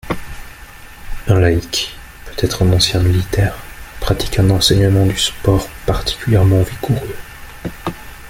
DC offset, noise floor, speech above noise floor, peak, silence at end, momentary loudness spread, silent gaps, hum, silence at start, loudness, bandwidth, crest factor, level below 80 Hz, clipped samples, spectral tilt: under 0.1%; -36 dBFS; 22 dB; 0 dBFS; 0 s; 22 LU; none; none; 0.05 s; -16 LUFS; 16.5 kHz; 16 dB; -30 dBFS; under 0.1%; -5 dB/octave